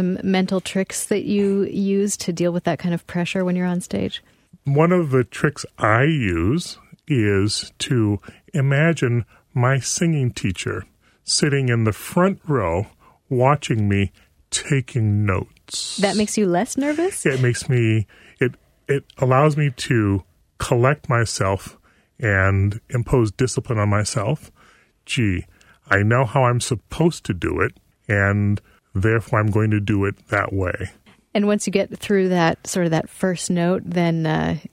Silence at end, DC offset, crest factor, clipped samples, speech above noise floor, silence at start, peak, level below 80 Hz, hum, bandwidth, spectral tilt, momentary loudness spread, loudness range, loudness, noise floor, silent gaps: 0.05 s; under 0.1%; 18 dB; under 0.1%; 35 dB; 0 s; -2 dBFS; -46 dBFS; none; 15.5 kHz; -5.5 dB/octave; 8 LU; 1 LU; -21 LUFS; -54 dBFS; none